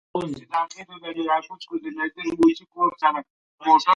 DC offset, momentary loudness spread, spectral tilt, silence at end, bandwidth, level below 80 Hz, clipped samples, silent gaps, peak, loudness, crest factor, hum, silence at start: under 0.1%; 13 LU; -5 dB/octave; 0 s; 11 kHz; -64 dBFS; under 0.1%; 3.30-3.58 s; -4 dBFS; -24 LUFS; 18 dB; none; 0.15 s